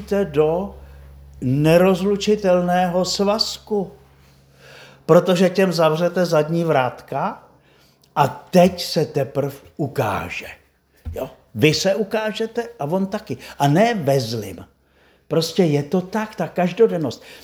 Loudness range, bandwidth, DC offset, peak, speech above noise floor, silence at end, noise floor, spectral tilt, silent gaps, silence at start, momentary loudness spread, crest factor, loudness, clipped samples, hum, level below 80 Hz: 4 LU; over 20 kHz; under 0.1%; 0 dBFS; 38 dB; 0.05 s; -57 dBFS; -6 dB/octave; none; 0 s; 14 LU; 20 dB; -19 LUFS; under 0.1%; none; -48 dBFS